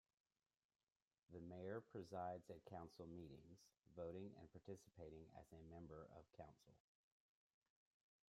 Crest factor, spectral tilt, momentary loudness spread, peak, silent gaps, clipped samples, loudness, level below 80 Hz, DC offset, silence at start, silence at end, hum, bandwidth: 22 dB; -7 dB/octave; 11 LU; -38 dBFS; 3.79-3.83 s; under 0.1%; -58 LUFS; -80 dBFS; under 0.1%; 1.3 s; 1.55 s; none; 13.5 kHz